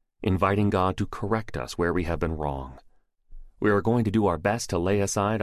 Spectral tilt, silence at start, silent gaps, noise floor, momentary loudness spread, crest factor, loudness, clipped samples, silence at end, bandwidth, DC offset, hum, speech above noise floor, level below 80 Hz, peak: -6 dB/octave; 0.2 s; none; -49 dBFS; 8 LU; 16 dB; -26 LUFS; under 0.1%; 0 s; 14 kHz; under 0.1%; none; 25 dB; -40 dBFS; -10 dBFS